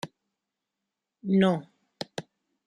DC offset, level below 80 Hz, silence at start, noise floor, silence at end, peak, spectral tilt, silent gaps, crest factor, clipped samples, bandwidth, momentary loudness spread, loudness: under 0.1%; -72 dBFS; 0.05 s; -86 dBFS; 0.45 s; -10 dBFS; -7 dB/octave; none; 20 dB; under 0.1%; 10.5 kHz; 18 LU; -27 LUFS